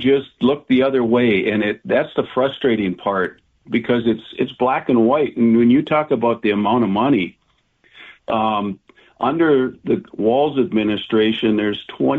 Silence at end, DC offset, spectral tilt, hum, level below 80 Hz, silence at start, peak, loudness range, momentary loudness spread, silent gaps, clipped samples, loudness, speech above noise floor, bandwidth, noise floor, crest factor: 0 s; under 0.1%; -8.5 dB/octave; none; -56 dBFS; 0 s; -6 dBFS; 4 LU; 8 LU; none; under 0.1%; -18 LUFS; 42 dB; 4.3 kHz; -60 dBFS; 12 dB